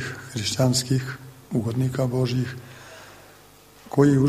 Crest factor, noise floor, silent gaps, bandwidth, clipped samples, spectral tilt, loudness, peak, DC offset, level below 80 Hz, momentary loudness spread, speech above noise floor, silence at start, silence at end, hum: 18 dB; -50 dBFS; none; 15 kHz; under 0.1%; -5.5 dB/octave; -24 LUFS; -6 dBFS; under 0.1%; -54 dBFS; 22 LU; 28 dB; 0 s; 0 s; 50 Hz at -50 dBFS